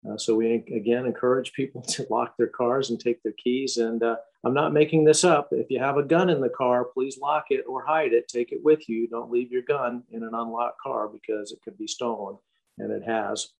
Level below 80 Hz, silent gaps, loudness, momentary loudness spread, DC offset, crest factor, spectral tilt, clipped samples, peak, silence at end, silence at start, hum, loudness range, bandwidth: -74 dBFS; none; -25 LUFS; 11 LU; under 0.1%; 18 dB; -4.5 dB/octave; under 0.1%; -6 dBFS; 0.15 s; 0.05 s; none; 8 LU; 11.5 kHz